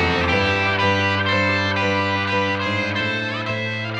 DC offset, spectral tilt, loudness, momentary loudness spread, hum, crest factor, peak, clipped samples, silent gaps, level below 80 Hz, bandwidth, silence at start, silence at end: under 0.1%; -5.5 dB/octave; -19 LUFS; 5 LU; none; 14 dB; -6 dBFS; under 0.1%; none; -44 dBFS; 8.8 kHz; 0 s; 0 s